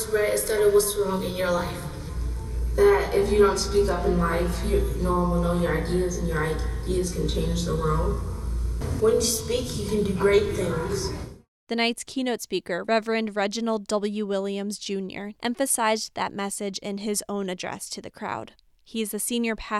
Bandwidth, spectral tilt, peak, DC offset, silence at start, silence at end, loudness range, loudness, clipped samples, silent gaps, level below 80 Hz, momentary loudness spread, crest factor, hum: 15.5 kHz; -4.5 dB/octave; -8 dBFS; under 0.1%; 0 s; 0 s; 5 LU; -25 LUFS; under 0.1%; 11.48-11.67 s; -34 dBFS; 11 LU; 18 dB; none